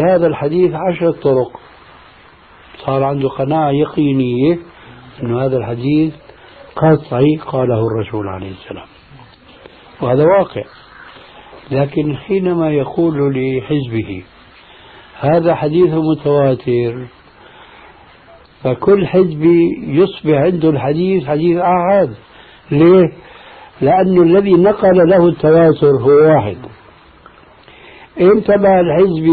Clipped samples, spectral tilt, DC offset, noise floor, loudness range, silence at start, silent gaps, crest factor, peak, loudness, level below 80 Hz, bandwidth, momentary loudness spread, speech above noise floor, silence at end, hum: under 0.1%; -11.5 dB/octave; under 0.1%; -43 dBFS; 7 LU; 0 s; none; 14 dB; 0 dBFS; -13 LUFS; -46 dBFS; 4.7 kHz; 12 LU; 31 dB; 0 s; none